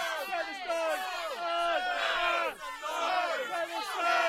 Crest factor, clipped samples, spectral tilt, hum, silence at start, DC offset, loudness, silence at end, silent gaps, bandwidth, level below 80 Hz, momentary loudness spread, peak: 16 dB; under 0.1%; 0 dB/octave; none; 0 s; under 0.1%; -31 LUFS; 0 s; none; 16 kHz; -64 dBFS; 6 LU; -16 dBFS